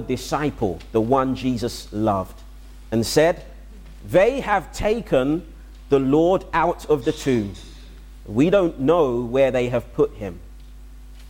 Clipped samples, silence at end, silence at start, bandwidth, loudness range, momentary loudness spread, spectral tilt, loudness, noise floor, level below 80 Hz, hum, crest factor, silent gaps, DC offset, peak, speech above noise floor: under 0.1%; 0 s; 0 s; 17 kHz; 2 LU; 10 LU; -6 dB/octave; -21 LUFS; -40 dBFS; -40 dBFS; none; 16 dB; none; under 0.1%; -6 dBFS; 20 dB